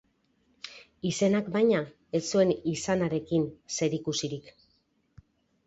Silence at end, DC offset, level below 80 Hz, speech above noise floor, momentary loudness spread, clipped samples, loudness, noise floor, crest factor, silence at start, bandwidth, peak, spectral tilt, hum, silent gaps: 1.15 s; under 0.1%; -64 dBFS; 43 dB; 16 LU; under 0.1%; -28 LUFS; -71 dBFS; 18 dB; 0.65 s; 8.2 kHz; -12 dBFS; -5 dB/octave; none; none